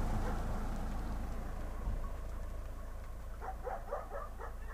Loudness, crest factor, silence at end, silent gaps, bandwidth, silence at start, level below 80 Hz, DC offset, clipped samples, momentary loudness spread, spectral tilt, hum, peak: -44 LUFS; 14 dB; 0 s; none; 15.5 kHz; 0 s; -40 dBFS; under 0.1%; under 0.1%; 8 LU; -6.5 dB/octave; none; -24 dBFS